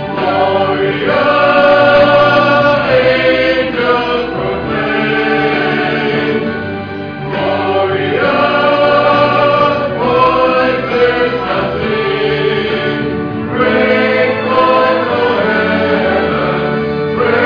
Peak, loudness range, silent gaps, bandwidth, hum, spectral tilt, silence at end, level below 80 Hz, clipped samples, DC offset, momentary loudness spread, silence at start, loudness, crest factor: 0 dBFS; 5 LU; none; 5.4 kHz; none; -7 dB/octave; 0 s; -40 dBFS; under 0.1%; 0.3%; 7 LU; 0 s; -12 LUFS; 12 dB